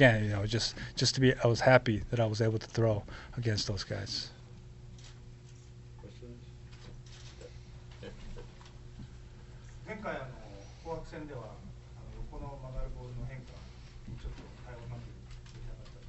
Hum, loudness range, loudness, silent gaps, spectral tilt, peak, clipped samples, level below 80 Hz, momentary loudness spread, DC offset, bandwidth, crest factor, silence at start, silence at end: none; 21 LU; -32 LUFS; none; -5 dB/octave; -8 dBFS; under 0.1%; -48 dBFS; 24 LU; under 0.1%; 8.2 kHz; 28 dB; 0 s; 0 s